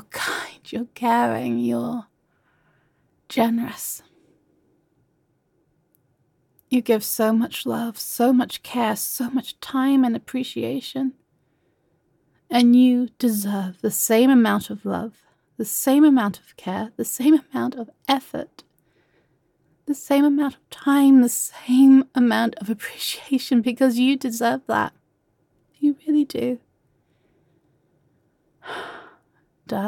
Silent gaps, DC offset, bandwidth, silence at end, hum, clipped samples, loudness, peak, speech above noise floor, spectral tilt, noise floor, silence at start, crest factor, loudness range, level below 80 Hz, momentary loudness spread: none; under 0.1%; 17.5 kHz; 0 s; none; under 0.1%; -21 LUFS; -6 dBFS; 47 dB; -4 dB/octave; -67 dBFS; 0.15 s; 16 dB; 11 LU; -68 dBFS; 15 LU